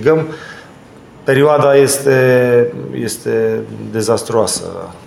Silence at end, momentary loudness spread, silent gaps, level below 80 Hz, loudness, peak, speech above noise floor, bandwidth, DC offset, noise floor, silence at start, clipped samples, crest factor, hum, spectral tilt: 0.1 s; 13 LU; none; -52 dBFS; -13 LUFS; 0 dBFS; 25 dB; 16 kHz; under 0.1%; -39 dBFS; 0 s; under 0.1%; 14 dB; none; -5 dB/octave